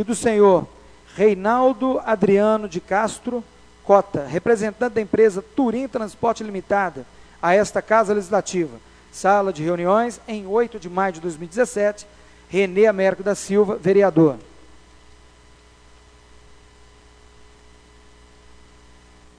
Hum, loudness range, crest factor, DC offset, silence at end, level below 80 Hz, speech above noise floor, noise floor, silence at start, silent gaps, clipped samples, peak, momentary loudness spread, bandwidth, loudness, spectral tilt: 60 Hz at -50 dBFS; 3 LU; 20 dB; under 0.1%; 4.95 s; -52 dBFS; 31 dB; -50 dBFS; 0 s; none; under 0.1%; 0 dBFS; 12 LU; 11 kHz; -20 LUFS; -6 dB/octave